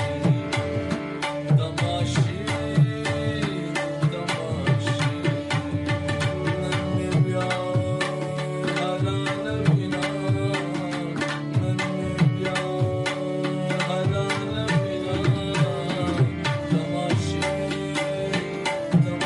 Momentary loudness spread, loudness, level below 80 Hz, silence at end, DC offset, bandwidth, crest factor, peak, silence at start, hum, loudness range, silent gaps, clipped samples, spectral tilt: 5 LU; -25 LUFS; -50 dBFS; 0 s; under 0.1%; 11.5 kHz; 16 dB; -8 dBFS; 0 s; none; 1 LU; none; under 0.1%; -6 dB/octave